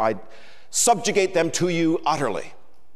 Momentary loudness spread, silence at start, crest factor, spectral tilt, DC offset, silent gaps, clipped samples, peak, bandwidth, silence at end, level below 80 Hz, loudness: 13 LU; 0 s; 16 dB; -3.5 dB/octave; 2%; none; under 0.1%; -8 dBFS; 15.5 kHz; 0.45 s; -60 dBFS; -21 LUFS